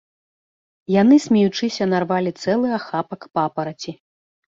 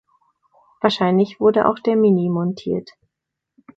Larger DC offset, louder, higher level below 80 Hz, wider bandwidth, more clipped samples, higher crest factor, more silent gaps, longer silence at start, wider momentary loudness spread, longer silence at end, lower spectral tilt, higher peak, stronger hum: neither; about the same, -19 LUFS vs -18 LUFS; about the same, -62 dBFS vs -62 dBFS; about the same, 7.8 kHz vs 7.6 kHz; neither; about the same, 16 dB vs 20 dB; neither; about the same, 0.9 s vs 0.85 s; first, 14 LU vs 9 LU; second, 0.6 s vs 0.95 s; second, -6 dB/octave vs -8 dB/octave; second, -4 dBFS vs 0 dBFS; neither